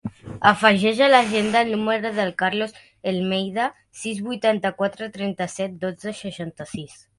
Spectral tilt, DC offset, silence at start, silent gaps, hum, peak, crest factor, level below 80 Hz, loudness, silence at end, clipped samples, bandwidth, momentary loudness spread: -4.5 dB/octave; under 0.1%; 0.05 s; none; none; 0 dBFS; 22 dB; -60 dBFS; -21 LUFS; 0.25 s; under 0.1%; 11.5 kHz; 16 LU